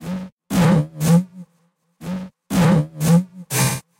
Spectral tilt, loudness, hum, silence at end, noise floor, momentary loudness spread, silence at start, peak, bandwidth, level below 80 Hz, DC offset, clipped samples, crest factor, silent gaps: -6 dB/octave; -18 LUFS; none; 0.2 s; -64 dBFS; 14 LU; 0 s; -6 dBFS; 16 kHz; -46 dBFS; under 0.1%; under 0.1%; 12 dB; 0.32-0.37 s